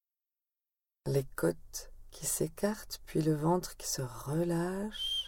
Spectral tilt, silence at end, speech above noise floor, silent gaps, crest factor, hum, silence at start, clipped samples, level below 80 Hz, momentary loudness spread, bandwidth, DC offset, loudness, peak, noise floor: -4.5 dB/octave; 0 s; over 56 dB; none; 18 dB; none; 1.05 s; under 0.1%; -54 dBFS; 12 LU; 18.5 kHz; under 0.1%; -34 LUFS; -18 dBFS; under -90 dBFS